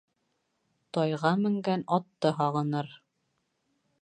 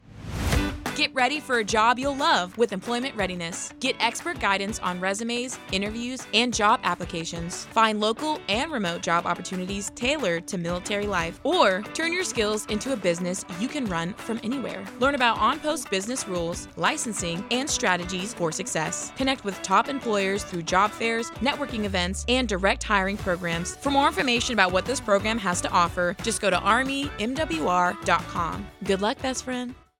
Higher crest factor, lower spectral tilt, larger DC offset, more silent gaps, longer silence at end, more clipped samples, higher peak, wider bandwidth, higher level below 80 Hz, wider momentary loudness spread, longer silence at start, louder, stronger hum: about the same, 20 dB vs 22 dB; first, -7.5 dB/octave vs -3.5 dB/octave; neither; neither; first, 1.05 s vs 0.25 s; neither; second, -10 dBFS vs -4 dBFS; second, 9.6 kHz vs 17.5 kHz; second, -78 dBFS vs -44 dBFS; about the same, 7 LU vs 8 LU; first, 0.95 s vs 0.1 s; second, -29 LUFS vs -25 LUFS; neither